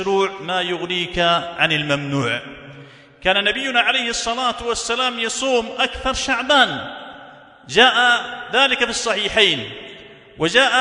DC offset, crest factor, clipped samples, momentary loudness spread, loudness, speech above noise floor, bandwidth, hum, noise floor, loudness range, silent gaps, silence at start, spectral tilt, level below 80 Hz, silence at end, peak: under 0.1%; 20 dB; under 0.1%; 11 LU; -18 LUFS; 24 dB; 11 kHz; none; -43 dBFS; 3 LU; none; 0 s; -2.5 dB/octave; -46 dBFS; 0 s; 0 dBFS